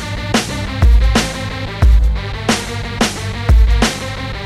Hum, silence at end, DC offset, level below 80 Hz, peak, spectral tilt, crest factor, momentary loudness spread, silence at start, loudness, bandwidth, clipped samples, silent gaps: none; 0 s; under 0.1%; -16 dBFS; -2 dBFS; -4.5 dB/octave; 12 dB; 10 LU; 0 s; -16 LUFS; 13 kHz; under 0.1%; none